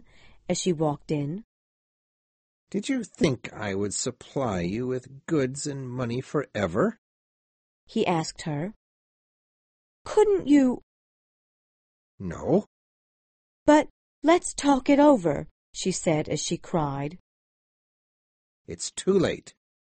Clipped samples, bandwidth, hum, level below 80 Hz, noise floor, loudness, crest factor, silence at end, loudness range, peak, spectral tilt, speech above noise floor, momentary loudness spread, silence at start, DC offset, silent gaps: under 0.1%; 8.8 kHz; none; -54 dBFS; under -90 dBFS; -26 LUFS; 22 dB; 0.4 s; 8 LU; -6 dBFS; -5.5 dB/octave; over 65 dB; 14 LU; 0.5 s; under 0.1%; 1.44-2.67 s, 6.98-7.87 s, 8.76-10.05 s, 10.83-12.18 s, 12.67-13.66 s, 13.90-14.22 s, 15.51-15.73 s, 17.20-18.65 s